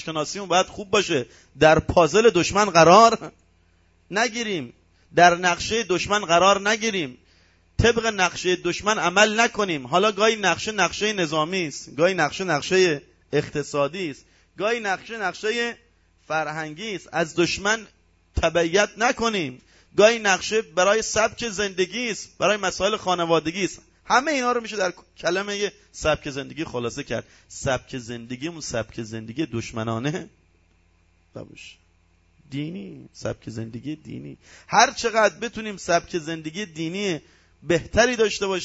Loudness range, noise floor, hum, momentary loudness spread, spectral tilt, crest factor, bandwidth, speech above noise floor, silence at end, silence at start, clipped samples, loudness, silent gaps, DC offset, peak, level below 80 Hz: 12 LU; -61 dBFS; none; 15 LU; -3.5 dB/octave; 22 dB; 8 kHz; 38 dB; 0 s; 0 s; under 0.1%; -22 LUFS; none; under 0.1%; 0 dBFS; -46 dBFS